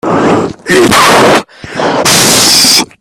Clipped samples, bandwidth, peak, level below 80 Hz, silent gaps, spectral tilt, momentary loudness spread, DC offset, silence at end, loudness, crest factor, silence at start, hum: 2%; over 20 kHz; 0 dBFS; -40 dBFS; none; -2 dB/octave; 9 LU; under 0.1%; 0.15 s; -6 LUFS; 8 dB; 0.05 s; none